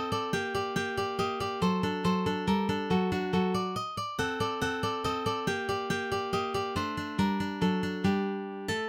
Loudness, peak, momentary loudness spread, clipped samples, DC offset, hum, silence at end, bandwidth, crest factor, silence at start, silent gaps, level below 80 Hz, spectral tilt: -30 LUFS; -16 dBFS; 4 LU; under 0.1%; under 0.1%; none; 0 s; 16.5 kHz; 14 dB; 0 s; none; -54 dBFS; -5.5 dB/octave